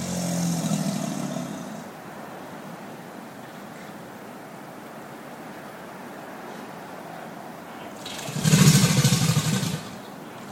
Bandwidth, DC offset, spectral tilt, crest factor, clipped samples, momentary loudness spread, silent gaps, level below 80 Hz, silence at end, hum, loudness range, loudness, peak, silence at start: 16.5 kHz; under 0.1%; -4.5 dB/octave; 24 dB; under 0.1%; 21 LU; none; -58 dBFS; 0 s; none; 17 LU; -23 LUFS; -2 dBFS; 0 s